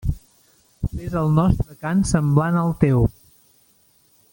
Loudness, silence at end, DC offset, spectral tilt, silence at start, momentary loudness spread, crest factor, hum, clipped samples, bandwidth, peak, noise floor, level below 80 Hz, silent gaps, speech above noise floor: -20 LUFS; 1.2 s; under 0.1%; -7.5 dB/octave; 0.05 s; 11 LU; 18 dB; none; under 0.1%; 17 kHz; -2 dBFS; -58 dBFS; -34 dBFS; none; 40 dB